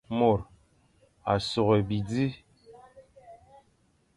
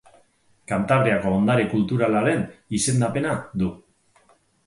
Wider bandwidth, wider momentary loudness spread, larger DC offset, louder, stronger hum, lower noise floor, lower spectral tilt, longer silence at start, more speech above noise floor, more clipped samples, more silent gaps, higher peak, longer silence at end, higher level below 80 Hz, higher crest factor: about the same, 11.5 kHz vs 11.5 kHz; first, 14 LU vs 8 LU; neither; second, -27 LUFS vs -22 LUFS; neither; first, -67 dBFS vs -61 dBFS; first, -7 dB/octave vs -5.5 dB/octave; second, 0.1 s vs 0.7 s; about the same, 42 dB vs 39 dB; neither; neither; second, -10 dBFS vs -6 dBFS; about the same, 0.8 s vs 0.9 s; about the same, -54 dBFS vs -50 dBFS; about the same, 20 dB vs 18 dB